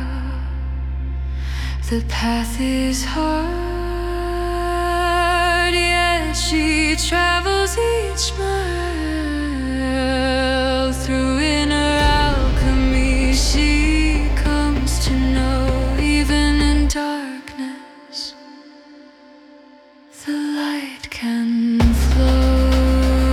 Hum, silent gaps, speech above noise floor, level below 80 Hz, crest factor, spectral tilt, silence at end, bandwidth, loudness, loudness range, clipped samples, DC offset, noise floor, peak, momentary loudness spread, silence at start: none; none; 27 dB; -22 dBFS; 14 dB; -5 dB/octave; 0 s; 14.5 kHz; -19 LUFS; 8 LU; under 0.1%; under 0.1%; -46 dBFS; -6 dBFS; 10 LU; 0 s